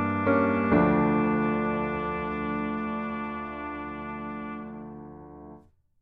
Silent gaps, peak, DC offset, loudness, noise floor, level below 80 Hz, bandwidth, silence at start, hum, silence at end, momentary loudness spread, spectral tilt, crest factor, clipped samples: none; -10 dBFS; under 0.1%; -27 LUFS; -53 dBFS; -50 dBFS; 4.9 kHz; 0 s; none; 0.4 s; 20 LU; -10 dB/octave; 18 dB; under 0.1%